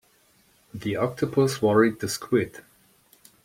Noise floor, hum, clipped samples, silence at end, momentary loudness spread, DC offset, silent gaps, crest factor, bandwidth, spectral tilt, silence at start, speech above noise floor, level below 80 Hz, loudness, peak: -62 dBFS; none; under 0.1%; 0.85 s; 14 LU; under 0.1%; none; 20 dB; 16.5 kHz; -5.5 dB/octave; 0.75 s; 38 dB; -62 dBFS; -24 LUFS; -6 dBFS